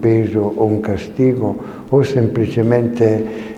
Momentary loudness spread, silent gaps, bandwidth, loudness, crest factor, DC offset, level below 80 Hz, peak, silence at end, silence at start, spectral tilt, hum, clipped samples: 6 LU; none; 9.4 kHz; -16 LUFS; 16 dB; under 0.1%; -46 dBFS; 0 dBFS; 0 s; 0 s; -9 dB/octave; none; under 0.1%